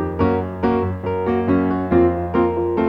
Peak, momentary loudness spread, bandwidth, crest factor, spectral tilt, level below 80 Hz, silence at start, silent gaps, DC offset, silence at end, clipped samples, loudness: -4 dBFS; 4 LU; 5.2 kHz; 14 dB; -10.5 dB/octave; -40 dBFS; 0 s; none; 0.3%; 0 s; under 0.1%; -19 LUFS